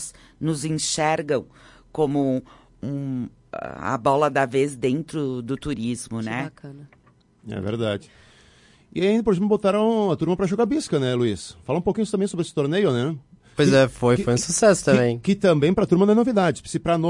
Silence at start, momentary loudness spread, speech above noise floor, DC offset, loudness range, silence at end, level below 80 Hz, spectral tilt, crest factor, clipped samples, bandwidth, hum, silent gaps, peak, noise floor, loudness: 0 s; 14 LU; 32 dB; under 0.1%; 9 LU; 0 s; -52 dBFS; -5.5 dB/octave; 18 dB; under 0.1%; 11.5 kHz; none; none; -4 dBFS; -54 dBFS; -22 LUFS